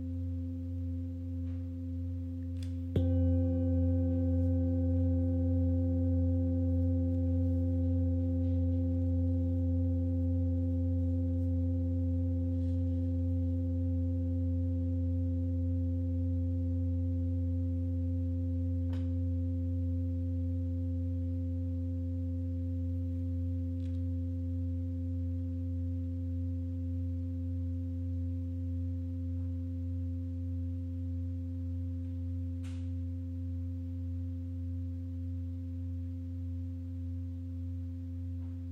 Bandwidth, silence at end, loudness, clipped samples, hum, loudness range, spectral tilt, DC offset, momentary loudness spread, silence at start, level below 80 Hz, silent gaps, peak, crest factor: 1.6 kHz; 0 s; -34 LUFS; under 0.1%; none; 8 LU; -11.5 dB/octave; under 0.1%; 8 LU; 0 s; -44 dBFS; none; -20 dBFS; 14 dB